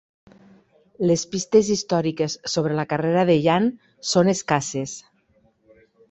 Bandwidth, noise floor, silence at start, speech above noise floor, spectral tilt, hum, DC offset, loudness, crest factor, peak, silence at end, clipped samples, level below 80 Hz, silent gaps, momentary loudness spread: 8.2 kHz; -62 dBFS; 1 s; 41 dB; -5 dB/octave; none; under 0.1%; -21 LUFS; 20 dB; -2 dBFS; 1.1 s; under 0.1%; -60 dBFS; none; 10 LU